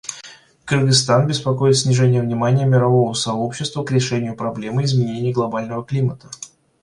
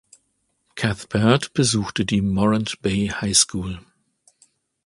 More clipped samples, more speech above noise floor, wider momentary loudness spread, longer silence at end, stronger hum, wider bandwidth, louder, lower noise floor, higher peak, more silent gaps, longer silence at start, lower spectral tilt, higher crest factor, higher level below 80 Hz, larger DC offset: neither; second, 25 dB vs 50 dB; first, 15 LU vs 12 LU; second, 0.35 s vs 1.05 s; neither; about the same, 11.5 kHz vs 11.5 kHz; about the same, -18 LUFS vs -20 LUFS; second, -43 dBFS vs -70 dBFS; about the same, -2 dBFS vs 0 dBFS; neither; second, 0.05 s vs 0.75 s; first, -5.5 dB/octave vs -4 dB/octave; second, 16 dB vs 22 dB; second, -54 dBFS vs -44 dBFS; neither